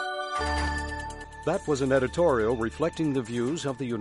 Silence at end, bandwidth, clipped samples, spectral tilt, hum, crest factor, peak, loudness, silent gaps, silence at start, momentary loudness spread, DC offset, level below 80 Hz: 0 s; 11.5 kHz; under 0.1%; -5.5 dB/octave; none; 16 dB; -12 dBFS; -28 LUFS; none; 0 s; 9 LU; under 0.1%; -40 dBFS